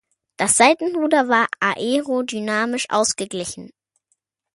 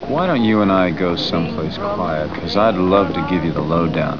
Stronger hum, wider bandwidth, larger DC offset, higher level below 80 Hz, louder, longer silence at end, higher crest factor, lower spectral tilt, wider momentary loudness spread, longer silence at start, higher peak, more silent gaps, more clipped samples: neither; first, 12 kHz vs 5.4 kHz; second, under 0.1% vs 1%; second, -62 dBFS vs -40 dBFS; about the same, -19 LUFS vs -17 LUFS; first, 0.9 s vs 0 s; about the same, 20 dB vs 16 dB; second, -2.5 dB/octave vs -7.5 dB/octave; first, 12 LU vs 7 LU; first, 0.4 s vs 0 s; about the same, -2 dBFS vs -2 dBFS; neither; neither